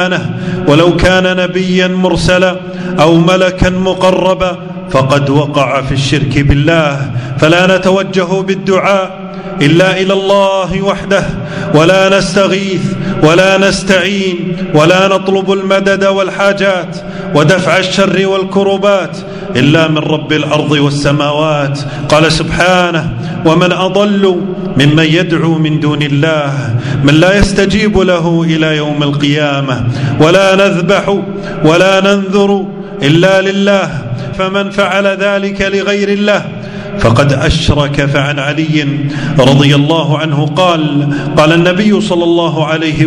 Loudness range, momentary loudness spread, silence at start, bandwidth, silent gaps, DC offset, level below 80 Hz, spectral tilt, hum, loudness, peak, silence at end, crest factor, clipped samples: 2 LU; 7 LU; 0 s; 11 kHz; none; under 0.1%; -30 dBFS; -5.5 dB/octave; none; -10 LUFS; 0 dBFS; 0 s; 10 dB; 2%